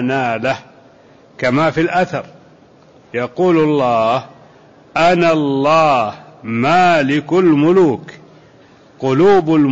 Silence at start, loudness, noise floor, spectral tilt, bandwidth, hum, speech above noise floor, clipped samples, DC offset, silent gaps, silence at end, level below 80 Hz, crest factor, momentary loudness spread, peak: 0 s; -14 LUFS; -46 dBFS; -6.5 dB/octave; 8 kHz; none; 32 dB; under 0.1%; under 0.1%; none; 0 s; -52 dBFS; 12 dB; 12 LU; -4 dBFS